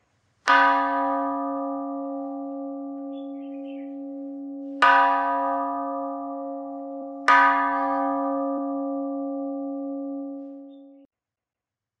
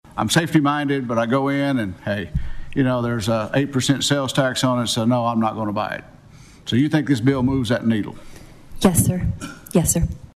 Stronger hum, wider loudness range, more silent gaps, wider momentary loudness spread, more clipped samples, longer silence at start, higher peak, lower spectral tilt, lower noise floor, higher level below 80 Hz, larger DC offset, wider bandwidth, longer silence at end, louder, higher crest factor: neither; first, 10 LU vs 1 LU; neither; first, 18 LU vs 8 LU; neither; first, 0.45 s vs 0.15 s; second, -6 dBFS vs -2 dBFS; second, -3 dB/octave vs -5 dB/octave; first, -89 dBFS vs -45 dBFS; second, -84 dBFS vs -38 dBFS; neither; second, 9.4 kHz vs 14.5 kHz; first, 1.05 s vs 0.1 s; second, -24 LUFS vs -20 LUFS; about the same, 20 dB vs 20 dB